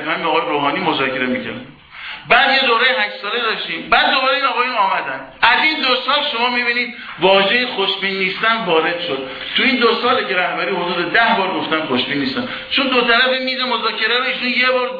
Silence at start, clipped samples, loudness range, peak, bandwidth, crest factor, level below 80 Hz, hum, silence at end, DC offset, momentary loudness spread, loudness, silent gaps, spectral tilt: 0 s; under 0.1%; 2 LU; 0 dBFS; 5.2 kHz; 16 dB; -54 dBFS; none; 0 s; under 0.1%; 8 LU; -15 LUFS; none; -5.5 dB/octave